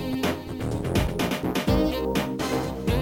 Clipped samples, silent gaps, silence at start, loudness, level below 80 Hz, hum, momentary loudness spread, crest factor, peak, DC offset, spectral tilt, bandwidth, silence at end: under 0.1%; none; 0 s; -26 LUFS; -36 dBFS; none; 5 LU; 16 dB; -8 dBFS; 0.2%; -6 dB/octave; 17 kHz; 0 s